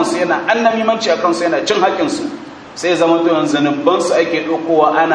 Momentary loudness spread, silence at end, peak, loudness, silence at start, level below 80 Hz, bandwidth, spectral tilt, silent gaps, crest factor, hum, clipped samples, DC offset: 7 LU; 0 s; 0 dBFS; -14 LUFS; 0 s; -58 dBFS; 10.5 kHz; -4 dB/octave; none; 14 dB; none; under 0.1%; under 0.1%